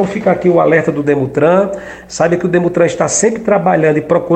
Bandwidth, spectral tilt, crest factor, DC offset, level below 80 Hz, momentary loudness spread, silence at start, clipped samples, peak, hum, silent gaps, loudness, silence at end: 9.2 kHz; -5.5 dB/octave; 12 dB; under 0.1%; -46 dBFS; 4 LU; 0 s; under 0.1%; 0 dBFS; none; none; -12 LUFS; 0 s